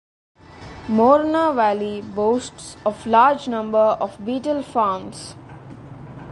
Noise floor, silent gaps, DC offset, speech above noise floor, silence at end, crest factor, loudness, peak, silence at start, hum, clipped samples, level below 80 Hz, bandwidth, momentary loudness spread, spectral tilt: -39 dBFS; none; under 0.1%; 20 dB; 0 s; 18 dB; -19 LUFS; -2 dBFS; 0.55 s; none; under 0.1%; -52 dBFS; 11.5 kHz; 23 LU; -5.5 dB/octave